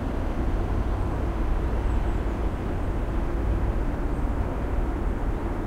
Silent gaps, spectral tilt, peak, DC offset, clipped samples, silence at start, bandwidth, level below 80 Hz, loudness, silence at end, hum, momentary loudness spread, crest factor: none; -8.5 dB/octave; -14 dBFS; under 0.1%; under 0.1%; 0 s; 9 kHz; -26 dBFS; -29 LUFS; 0 s; none; 2 LU; 12 dB